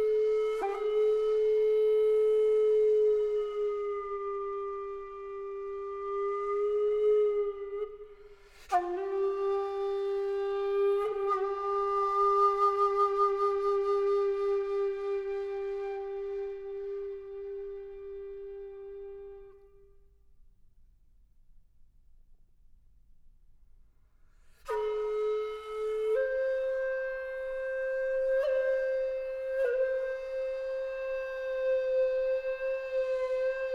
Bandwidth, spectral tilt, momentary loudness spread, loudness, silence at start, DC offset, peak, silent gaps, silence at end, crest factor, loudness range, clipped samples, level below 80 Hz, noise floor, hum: 7 kHz; -4.5 dB/octave; 14 LU; -30 LUFS; 0 s; under 0.1%; -16 dBFS; none; 0 s; 14 dB; 13 LU; under 0.1%; -60 dBFS; -60 dBFS; none